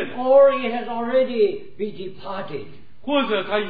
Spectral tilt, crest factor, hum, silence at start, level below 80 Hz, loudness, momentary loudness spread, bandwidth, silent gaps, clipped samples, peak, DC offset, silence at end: -8.5 dB/octave; 16 dB; none; 0 s; -60 dBFS; -20 LUFS; 19 LU; 4.9 kHz; none; under 0.1%; -4 dBFS; 2%; 0 s